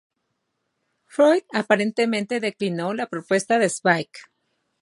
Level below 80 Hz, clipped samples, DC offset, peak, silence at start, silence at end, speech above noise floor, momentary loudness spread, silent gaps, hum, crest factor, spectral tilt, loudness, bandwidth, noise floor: -76 dBFS; under 0.1%; under 0.1%; -2 dBFS; 1.15 s; 0.6 s; 54 dB; 8 LU; none; none; 22 dB; -4.5 dB/octave; -22 LUFS; 11.5 kHz; -76 dBFS